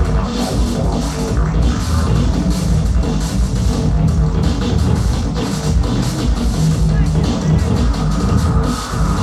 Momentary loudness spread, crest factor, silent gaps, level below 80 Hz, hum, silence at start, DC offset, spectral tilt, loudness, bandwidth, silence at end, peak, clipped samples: 3 LU; 12 dB; none; -18 dBFS; none; 0 s; under 0.1%; -6.5 dB/octave; -17 LUFS; 13 kHz; 0 s; -2 dBFS; under 0.1%